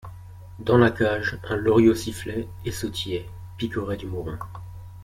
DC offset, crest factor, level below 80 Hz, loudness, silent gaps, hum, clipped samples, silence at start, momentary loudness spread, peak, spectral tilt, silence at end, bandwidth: under 0.1%; 20 dB; -46 dBFS; -24 LUFS; none; none; under 0.1%; 0.05 s; 22 LU; -6 dBFS; -6 dB/octave; 0 s; 16 kHz